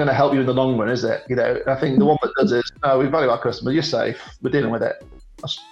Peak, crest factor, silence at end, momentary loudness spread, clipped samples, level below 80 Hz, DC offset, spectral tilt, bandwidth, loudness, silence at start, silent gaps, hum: -4 dBFS; 16 dB; 0.1 s; 9 LU; under 0.1%; -50 dBFS; under 0.1%; -6.5 dB/octave; 8.2 kHz; -20 LUFS; 0 s; none; none